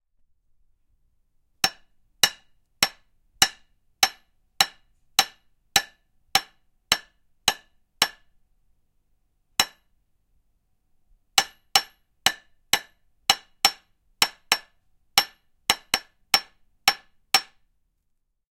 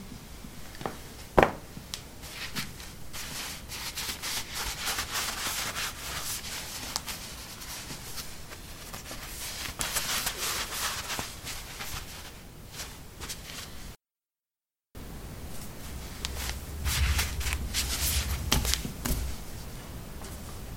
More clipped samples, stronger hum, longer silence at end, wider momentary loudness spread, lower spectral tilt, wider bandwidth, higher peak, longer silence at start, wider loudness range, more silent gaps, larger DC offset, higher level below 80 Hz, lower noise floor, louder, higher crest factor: neither; neither; first, 1.1 s vs 0 s; second, 5 LU vs 15 LU; second, 1 dB/octave vs -2.5 dB/octave; about the same, 16.5 kHz vs 16.5 kHz; about the same, 0 dBFS vs -2 dBFS; first, 1.65 s vs 0 s; second, 5 LU vs 11 LU; neither; neither; second, -58 dBFS vs -42 dBFS; second, -73 dBFS vs under -90 dBFS; first, -24 LUFS vs -33 LUFS; about the same, 28 dB vs 32 dB